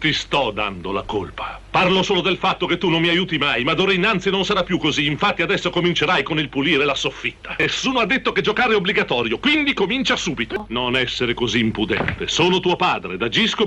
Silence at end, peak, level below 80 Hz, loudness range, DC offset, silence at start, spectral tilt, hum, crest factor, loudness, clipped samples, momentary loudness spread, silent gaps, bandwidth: 0 s; -6 dBFS; -44 dBFS; 2 LU; under 0.1%; 0 s; -4.5 dB/octave; none; 14 dB; -19 LUFS; under 0.1%; 7 LU; none; 9.6 kHz